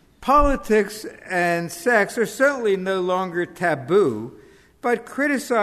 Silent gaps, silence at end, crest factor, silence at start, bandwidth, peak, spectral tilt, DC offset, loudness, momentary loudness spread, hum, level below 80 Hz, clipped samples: none; 0 s; 16 dB; 0.2 s; 13.5 kHz; -4 dBFS; -5 dB/octave; under 0.1%; -21 LUFS; 8 LU; none; -38 dBFS; under 0.1%